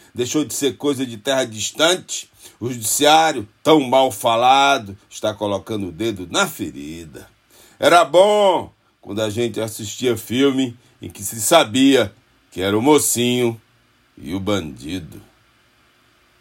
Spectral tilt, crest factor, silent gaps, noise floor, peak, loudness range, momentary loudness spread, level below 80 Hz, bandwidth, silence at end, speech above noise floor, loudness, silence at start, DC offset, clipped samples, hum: -3.5 dB/octave; 18 dB; none; -58 dBFS; 0 dBFS; 5 LU; 17 LU; -58 dBFS; 16.5 kHz; 1.2 s; 39 dB; -18 LUFS; 0.15 s; under 0.1%; under 0.1%; none